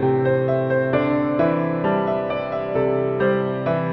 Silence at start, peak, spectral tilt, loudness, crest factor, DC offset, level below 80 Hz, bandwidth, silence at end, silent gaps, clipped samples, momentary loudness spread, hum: 0 s; -6 dBFS; -10.5 dB/octave; -21 LUFS; 14 dB; under 0.1%; -52 dBFS; 5.8 kHz; 0 s; none; under 0.1%; 4 LU; none